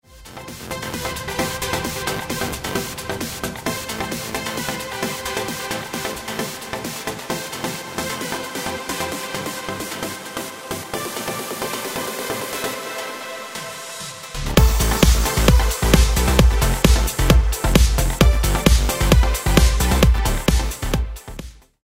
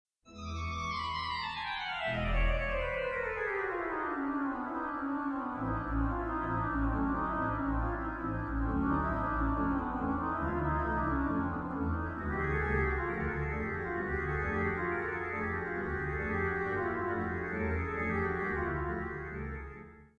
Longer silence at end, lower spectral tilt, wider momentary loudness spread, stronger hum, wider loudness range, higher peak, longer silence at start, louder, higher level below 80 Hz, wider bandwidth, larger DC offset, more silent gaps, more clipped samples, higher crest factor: first, 0.3 s vs 0.15 s; second, -4.5 dB/octave vs -7.5 dB/octave; first, 13 LU vs 4 LU; neither; first, 10 LU vs 2 LU; first, 0 dBFS vs -20 dBFS; second, 0.1 s vs 0.25 s; first, -21 LUFS vs -34 LUFS; first, -22 dBFS vs -42 dBFS; first, 16.5 kHz vs 8.4 kHz; neither; neither; neither; first, 20 dB vs 14 dB